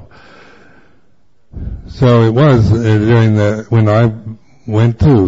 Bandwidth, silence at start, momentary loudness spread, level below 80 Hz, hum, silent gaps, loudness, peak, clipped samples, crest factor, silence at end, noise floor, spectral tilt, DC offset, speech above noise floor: 7.6 kHz; 1.55 s; 19 LU; -32 dBFS; none; none; -11 LUFS; 0 dBFS; under 0.1%; 12 dB; 0 s; -57 dBFS; -8.5 dB/octave; 0.7%; 48 dB